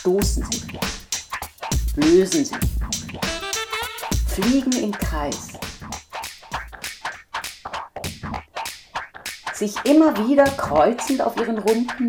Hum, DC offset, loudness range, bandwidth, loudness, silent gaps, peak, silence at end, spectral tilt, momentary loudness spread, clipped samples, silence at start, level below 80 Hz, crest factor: none; under 0.1%; 11 LU; over 20 kHz; -22 LUFS; none; -4 dBFS; 0 s; -4.5 dB/octave; 15 LU; under 0.1%; 0 s; -32 dBFS; 18 dB